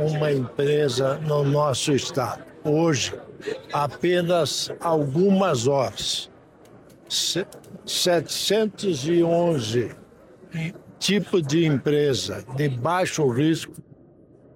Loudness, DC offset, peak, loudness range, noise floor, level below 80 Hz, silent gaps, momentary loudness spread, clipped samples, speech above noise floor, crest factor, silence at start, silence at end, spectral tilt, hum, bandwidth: -23 LUFS; under 0.1%; -10 dBFS; 2 LU; -52 dBFS; -58 dBFS; none; 10 LU; under 0.1%; 29 dB; 14 dB; 0 s; 0.75 s; -5 dB/octave; none; 16.5 kHz